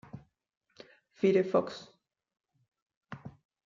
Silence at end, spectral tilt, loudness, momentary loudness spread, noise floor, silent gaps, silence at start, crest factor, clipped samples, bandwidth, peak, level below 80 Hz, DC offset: 0.35 s; -7 dB/octave; -29 LUFS; 25 LU; -58 dBFS; 0.57-0.61 s, 2.82-2.86 s, 2.97-3.01 s; 0.15 s; 22 dB; under 0.1%; 7.4 kHz; -14 dBFS; -76 dBFS; under 0.1%